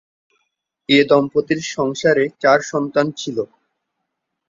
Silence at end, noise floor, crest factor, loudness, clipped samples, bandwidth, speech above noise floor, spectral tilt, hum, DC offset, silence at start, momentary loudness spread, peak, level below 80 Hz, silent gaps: 1.05 s; -77 dBFS; 18 dB; -17 LUFS; under 0.1%; 7.6 kHz; 60 dB; -4.5 dB/octave; none; under 0.1%; 0.9 s; 11 LU; -2 dBFS; -60 dBFS; none